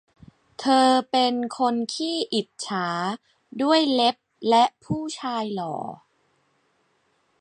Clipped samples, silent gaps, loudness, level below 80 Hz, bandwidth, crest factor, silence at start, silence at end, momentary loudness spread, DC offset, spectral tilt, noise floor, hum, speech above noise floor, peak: under 0.1%; none; -23 LUFS; -66 dBFS; 11.5 kHz; 18 dB; 0.6 s; 1.45 s; 11 LU; under 0.1%; -4 dB/octave; -68 dBFS; none; 45 dB; -6 dBFS